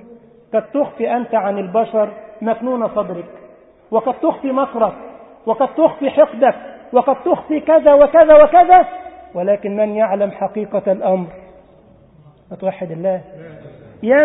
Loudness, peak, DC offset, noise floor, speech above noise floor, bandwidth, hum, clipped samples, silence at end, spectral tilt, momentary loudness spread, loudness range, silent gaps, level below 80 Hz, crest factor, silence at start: -15 LUFS; 0 dBFS; under 0.1%; -47 dBFS; 33 dB; 3.9 kHz; none; under 0.1%; 0 s; -11 dB/octave; 16 LU; 10 LU; none; -52 dBFS; 16 dB; 0.55 s